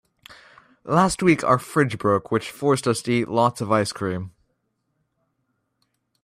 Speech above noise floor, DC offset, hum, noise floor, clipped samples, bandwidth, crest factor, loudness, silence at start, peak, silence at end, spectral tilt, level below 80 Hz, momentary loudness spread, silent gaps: 52 dB; under 0.1%; none; -73 dBFS; under 0.1%; 15 kHz; 20 dB; -21 LUFS; 0.3 s; -4 dBFS; 1.95 s; -5.5 dB/octave; -56 dBFS; 10 LU; none